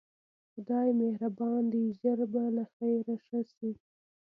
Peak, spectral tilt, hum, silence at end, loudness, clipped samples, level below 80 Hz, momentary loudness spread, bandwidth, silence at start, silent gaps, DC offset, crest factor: -18 dBFS; -11 dB/octave; none; 0.55 s; -32 LUFS; under 0.1%; -82 dBFS; 11 LU; 2.3 kHz; 0.55 s; 2.73-2.80 s, 3.57-3.61 s; under 0.1%; 14 dB